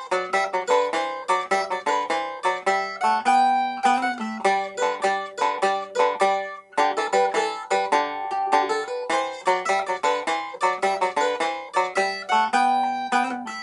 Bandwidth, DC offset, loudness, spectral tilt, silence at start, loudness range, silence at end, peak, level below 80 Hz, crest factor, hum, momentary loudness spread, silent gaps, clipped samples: 11.5 kHz; under 0.1%; -23 LUFS; -2.5 dB/octave; 0 s; 1 LU; 0 s; -6 dBFS; -74 dBFS; 18 dB; none; 5 LU; none; under 0.1%